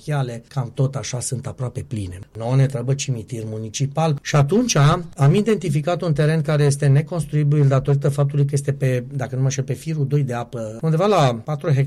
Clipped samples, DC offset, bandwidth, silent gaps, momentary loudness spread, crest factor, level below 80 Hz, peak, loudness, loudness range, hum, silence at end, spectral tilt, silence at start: under 0.1%; under 0.1%; 12 kHz; none; 11 LU; 12 dB; -48 dBFS; -8 dBFS; -20 LUFS; 6 LU; none; 0 s; -6.5 dB/octave; 0.05 s